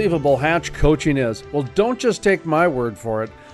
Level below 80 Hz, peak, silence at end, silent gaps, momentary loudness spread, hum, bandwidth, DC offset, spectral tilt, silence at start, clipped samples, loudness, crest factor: -32 dBFS; -4 dBFS; 0 s; none; 8 LU; none; 12 kHz; under 0.1%; -6 dB/octave; 0 s; under 0.1%; -19 LUFS; 14 dB